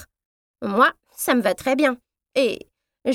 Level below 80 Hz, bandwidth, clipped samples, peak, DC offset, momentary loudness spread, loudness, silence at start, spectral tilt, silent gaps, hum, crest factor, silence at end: -62 dBFS; 17 kHz; under 0.1%; -4 dBFS; under 0.1%; 13 LU; -21 LUFS; 0 s; -3.5 dB/octave; 0.26-0.54 s; none; 20 dB; 0 s